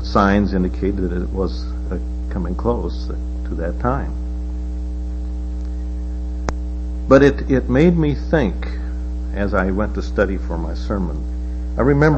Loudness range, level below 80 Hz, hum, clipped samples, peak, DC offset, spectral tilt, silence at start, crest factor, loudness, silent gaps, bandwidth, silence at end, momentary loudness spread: 8 LU; -24 dBFS; none; under 0.1%; 0 dBFS; under 0.1%; -8 dB/octave; 0 s; 18 dB; -21 LUFS; none; 7.2 kHz; 0 s; 12 LU